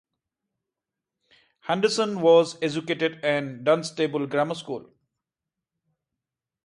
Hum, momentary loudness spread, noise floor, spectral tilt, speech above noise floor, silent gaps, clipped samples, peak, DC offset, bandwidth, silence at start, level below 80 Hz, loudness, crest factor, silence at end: none; 13 LU; -87 dBFS; -5 dB/octave; 64 dB; none; under 0.1%; -6 dBFS; under 0.1%; 11 kHz; 1.65 s; -74 dBFS; -24 LUFS; 20 dB; 1.85 s